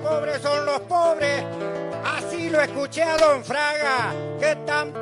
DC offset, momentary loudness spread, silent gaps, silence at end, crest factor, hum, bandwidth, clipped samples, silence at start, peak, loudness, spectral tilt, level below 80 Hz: under 0.1%; 8 LU; none; 0 s; 16 dB; none; 11.5 kHz; under 0.1%; 0 s; -6 dBFS; -23 LUFS; -4 dB/octave; -58 dBFS